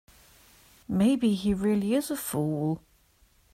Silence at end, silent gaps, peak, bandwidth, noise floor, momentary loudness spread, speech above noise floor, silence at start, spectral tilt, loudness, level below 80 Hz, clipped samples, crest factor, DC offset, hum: 0.75 s; none; -14 dBFS; 16 kHz; -63 dBFS; 8 LU; 37 dB; 0.9 s; -6 dB/octave; -27 LUFS; -54 dBFS; under 0.1%; 14 dB; under 0.1%; none